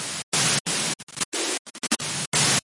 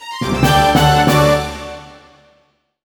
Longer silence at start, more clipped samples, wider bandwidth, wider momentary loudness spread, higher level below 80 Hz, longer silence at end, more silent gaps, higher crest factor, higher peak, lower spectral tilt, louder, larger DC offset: about the same, 0 s vs 0 s; neither; second, 11.5 kHz vs over 20 kHz; second, 7 LU vs 18 LU; second, -62 dBFS vs -30 dBFS; second, 0.05 s vs 0.95 s; first, 0.23-0.32 s, 0.60-0.65 s, 1.03-1.07 s, 1.25-1.32 s, 1.59-1.65 s, 2.27-2.32 s vs none; about the same, 18 dB vs 14 dB; second, -8 dBFS vs 0 dBFS; second, -1.5 dB/octave vs -5 dB/octave; second, -24 LUFS vs -13 LUFS; neither